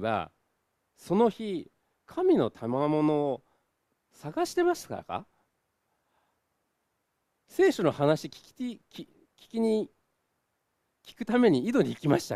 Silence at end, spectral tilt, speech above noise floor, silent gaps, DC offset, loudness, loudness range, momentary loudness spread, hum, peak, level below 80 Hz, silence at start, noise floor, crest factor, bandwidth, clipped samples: 0 s; -6.5 dB/octave; 51 dB; none; under 0.1%; -28 LUFS; 6 LU; 16 LU; none; -10 dBFS; -68 dBFS; 0 s; -79 dBFS; 20 dB; 14.5 kHz; under 0.1%